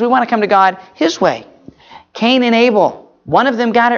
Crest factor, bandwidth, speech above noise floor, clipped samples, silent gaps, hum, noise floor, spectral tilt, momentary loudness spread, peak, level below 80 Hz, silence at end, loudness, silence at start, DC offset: 14 dB; 7.2 kHz; 27 dB; under 0.1%; none; none; -39 dBFS; -5 dB/octave; 7 LU; 0 dBFS; -56 dBFS; 0 s; -13 LUFS; 0 s; under 0.1%